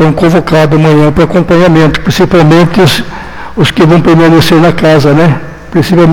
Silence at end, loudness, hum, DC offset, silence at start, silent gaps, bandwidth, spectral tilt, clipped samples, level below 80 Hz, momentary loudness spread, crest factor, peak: 0 s; -6 LUFS; none; under 0.1%; 0 s; none; 17 kHz; -6.5 dB/octave; 3%; -28 dBFS; 8 LU; 6 dB; 0 dBFS